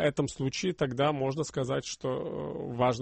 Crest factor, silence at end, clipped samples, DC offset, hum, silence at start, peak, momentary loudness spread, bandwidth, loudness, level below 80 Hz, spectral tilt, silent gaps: 16 dB; 0 s; under 0.1%; under 0.1%; none; 0 s; -14 dBFS; 7 LU; 8.8 kHz; -31 LUFS; -58 dBFS; -5.5 dB/octave; none